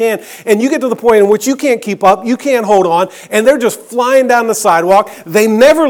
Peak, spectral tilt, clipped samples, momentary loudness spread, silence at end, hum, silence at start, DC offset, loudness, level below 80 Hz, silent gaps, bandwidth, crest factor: 0 dBFS; -4 dB/octave; 0.5%; 6 LU; 0 s; none; 0 s; under 0.1%; -11 LUFS; -50 dBFS; none; 19.5 kHz; 10 dB